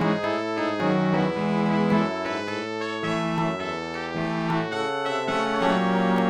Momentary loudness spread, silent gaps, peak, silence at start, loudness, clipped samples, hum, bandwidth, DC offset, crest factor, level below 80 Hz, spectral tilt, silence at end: 7 LU; none; -8 dBFS; 0 s; -25 LUFS; under 0.1%; none; 11 kHz; under 0.1%; 16 dB; -58 dBFS; -6.5 dB/octave; 0 s